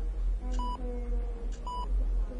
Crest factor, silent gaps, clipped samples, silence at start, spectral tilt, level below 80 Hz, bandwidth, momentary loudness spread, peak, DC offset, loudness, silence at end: 10 dB; none; under 0.1%; 0 s; -7 dB/octave; -32 dBFS; 7.6 kHz; 5 LU; -22 dBFS; under 0.1%; -36 LUFS; 0 s